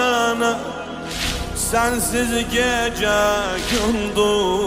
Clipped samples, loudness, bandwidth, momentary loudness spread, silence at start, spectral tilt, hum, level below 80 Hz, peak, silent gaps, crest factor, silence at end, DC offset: under 0.1%; -20 LUFS; 16 kHz; 6 LU; 0 s; -3 dB/octave; none; -34 dBFS; -6 dBFS; none; 14 dB; 0 s; under 0.1%